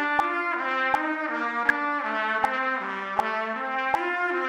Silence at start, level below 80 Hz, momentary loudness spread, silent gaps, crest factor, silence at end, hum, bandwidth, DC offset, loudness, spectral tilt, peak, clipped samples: 0 s; -66 dBFS; 4 LU; none; 20 dB; 0 s; none; 15.5 kHz; under 0.1%; -26 LUFS; -4 dB/octave; -6 dBFS; under 0.1%